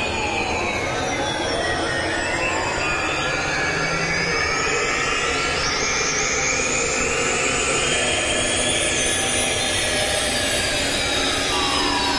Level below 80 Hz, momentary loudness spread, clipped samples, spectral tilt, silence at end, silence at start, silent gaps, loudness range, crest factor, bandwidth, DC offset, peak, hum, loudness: -38 dBFS; 3 LU; under 0.1%; -2 dB/octave; 0 s; 0 s; none; 3 LU; 16 dB; 11.5 kHz; under 0.1%; -6 dBFS; none; -20 LUFS